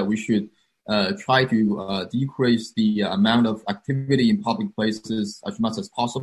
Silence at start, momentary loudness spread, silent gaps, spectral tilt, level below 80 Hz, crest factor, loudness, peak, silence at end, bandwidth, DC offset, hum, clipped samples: 0 s; 8 LU; none; -6 dB/octave; -56 dBFS; 18 dB; -23 LUFS; -4 dBFS; 0 s; 11.5 kHz; under 0.1%; none; under 0.1%